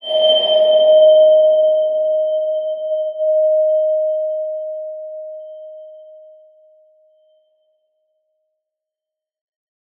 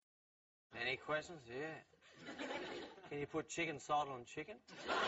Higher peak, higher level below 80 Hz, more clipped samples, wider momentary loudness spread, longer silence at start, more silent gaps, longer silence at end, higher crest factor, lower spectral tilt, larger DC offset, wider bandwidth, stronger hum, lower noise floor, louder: first, -4 dBFS vs -26 dBFS; second, -84 dBFS vs -76 dBFS; neither; first, 21 LU vs 13 LU; second, 0.05 s vs 0.7 s; neither; first, 3.95 s vs 0 s; second, 14 dB vs 20 dB; first, -3.5 dB/octave vs -2 dB/octave; neither; second, 3.6 kHz vs 8 kHz; neither; second, -86 dBFS vs under -90 dBFS; first, -14 LUFS vs -45 LUFS